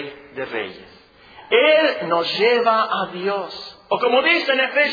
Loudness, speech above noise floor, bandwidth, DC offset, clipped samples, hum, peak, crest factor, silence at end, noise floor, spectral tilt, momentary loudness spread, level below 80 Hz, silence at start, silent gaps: -18 LUFS; 27 dB; 5 kHz; under 0.1%; under 0.1%; none; -2 dBFS; 16 dB; 0 s; -45 dBFS; -5 dB/octave; 16 LU; -66 dBFS; 0 s; none